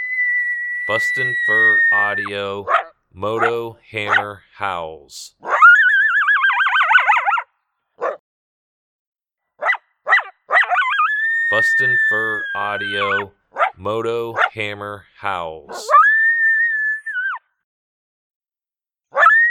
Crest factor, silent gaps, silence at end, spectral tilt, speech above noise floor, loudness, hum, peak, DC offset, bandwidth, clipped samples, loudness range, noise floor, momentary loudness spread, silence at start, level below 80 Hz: 18 dB; 8.20-9.12 s, 17.64-18.40 s; 0 s; -3 dB/octave; over 71 dB; -16 LUFS; none; 0 dBFS; under 0.1%; 14.5 kHz; under 0.1%; 8 LU; under -90 dBFS; 15 LU; 0 s; -64 dBFS